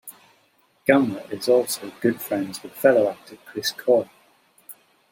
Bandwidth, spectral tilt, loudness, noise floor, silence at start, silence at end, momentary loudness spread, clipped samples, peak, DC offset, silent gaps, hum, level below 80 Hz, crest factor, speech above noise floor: 16.5 kHz; -4.5 dB/octave; -22 LUFS; -62 dBFS; 0.05 s; 0.4 s; 15 LU; under 0.1%; -2 dBFS; under 0.1%; none; none; -70 dBFS; 22 dB; 41 dB